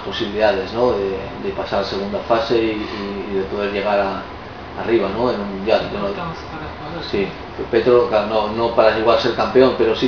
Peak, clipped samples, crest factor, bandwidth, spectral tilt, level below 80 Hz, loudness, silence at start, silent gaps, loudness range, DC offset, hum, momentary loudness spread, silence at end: 0 dBFS; under 0.1%; 18 dB; 5.4 kHz; -6.5 dB/octave; -42 dBFS; -19 LUFS; 0 s; none; 5 LU; 0.3%; none; 14 LU; 0 s